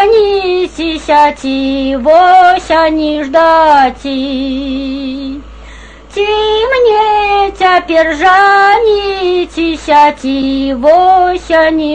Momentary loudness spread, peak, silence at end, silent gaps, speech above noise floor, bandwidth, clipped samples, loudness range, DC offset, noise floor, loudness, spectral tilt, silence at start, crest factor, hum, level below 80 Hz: 11 LU; 0 dBFS; 0 s; none; 23 dB; 9.4 kHz; under 0.1%; 4 LU; 0.4%; -32 dBFS; -9 LUFS; -4.5 dB/octave; 0 s; 10 dB; none; -34 dBFS